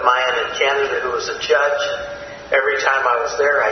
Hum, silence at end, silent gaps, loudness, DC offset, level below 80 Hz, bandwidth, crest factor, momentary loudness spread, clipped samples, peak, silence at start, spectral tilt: none; 0 s; none; -18 LUFS; under 0.1%; -52 dBFS; 6.4 kHz; 18 dB; 7 LU; under 0.1%; 0 dBFS; 0 s; -1.5 dB/octave